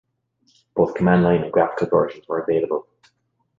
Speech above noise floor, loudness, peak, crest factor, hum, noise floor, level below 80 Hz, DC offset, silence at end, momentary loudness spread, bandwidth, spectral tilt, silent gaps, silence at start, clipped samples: 51 dB; -20 LUFS; -4 dBFS; 18 dB; none; -70 dBFS; -52 dBFS; under 0.1%; 0.75 s; 9 LU; 7.4 kHz; -9.5 dB/octave; none; 0.75 s; under 0.1%